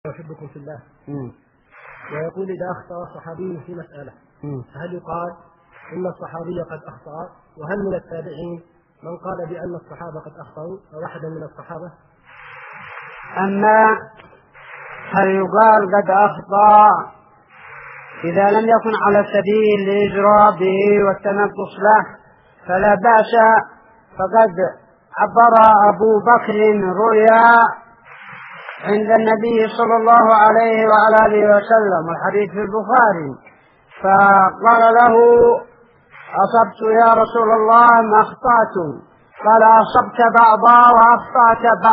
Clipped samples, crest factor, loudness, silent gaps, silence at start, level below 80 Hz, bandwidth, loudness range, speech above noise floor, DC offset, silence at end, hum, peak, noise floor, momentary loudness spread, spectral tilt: under 0.1%; 14 dB; -13 LUFS; none; 0.05 s; -54 dBFS; 5.4 kHz; 19 LU; 33 dB; under 0.1%; 0 s; none; 0 dBFS; -47 dBFS; 24 LU; -4.5 dB/octave